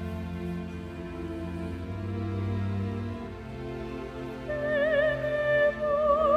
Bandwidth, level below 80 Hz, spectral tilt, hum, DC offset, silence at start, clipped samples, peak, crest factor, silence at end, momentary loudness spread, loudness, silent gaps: 10.5 kHz; -46 dBFS; -7.5 dB/octave; none; under 0.1%; 0 s; under 0.1%; -12 dBFS; 16 dB; 0 s; 13 LU; -30 LUFS; none